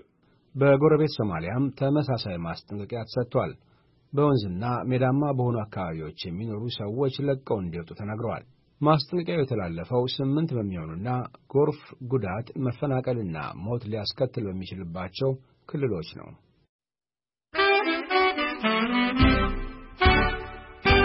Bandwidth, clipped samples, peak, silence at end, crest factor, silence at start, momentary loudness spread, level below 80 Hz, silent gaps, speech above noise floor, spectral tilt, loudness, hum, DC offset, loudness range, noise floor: 5.8 kHz; under 0.1%; -8 dBFS; 0 s; 20 dB; 0.55 s; 13 LU; -40 dBFS; 16.69-16.79 s; over 63 dB; -10.5 dB/octave; -26 LUFS; none; under 0.1%; 7 LU; under -90 dBFS